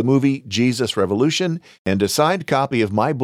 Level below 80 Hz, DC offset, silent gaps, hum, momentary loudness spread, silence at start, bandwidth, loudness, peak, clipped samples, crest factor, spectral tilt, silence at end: -58 dBFS; under 0.1%; 1.79-1.85 s; none; 5 LU; 0 s; 15.5 kHz; -19 LUFS; -4 dBFS; under 0.1%; 14 dB; -5 dB/octave; 0 s